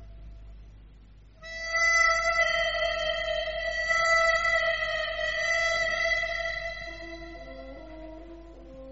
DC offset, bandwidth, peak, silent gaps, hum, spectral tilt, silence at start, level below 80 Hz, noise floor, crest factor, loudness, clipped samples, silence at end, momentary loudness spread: 0.1%; 8 kHz; -12 dBFS; none; none; 1 dB/octave; 0 s; -48 dBFS; -52 dBFS; 16 dB; -25 LUFS; under 0.1%; 0 s; 22 LU